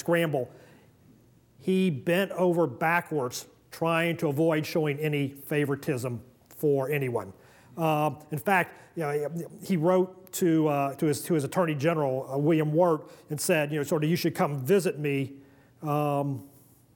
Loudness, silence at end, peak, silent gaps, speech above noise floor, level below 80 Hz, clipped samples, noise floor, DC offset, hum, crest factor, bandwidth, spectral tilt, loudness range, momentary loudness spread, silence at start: -27 LUFS; 0.5 s; -10 dBFS; none; 32 dB; -72 dBFS; under 0.1%; -59 dBFS; under 0.1%; none; 16 dB; 20 kHz; -6 dB/octave; 3 LU; 10 LU; 0.05 s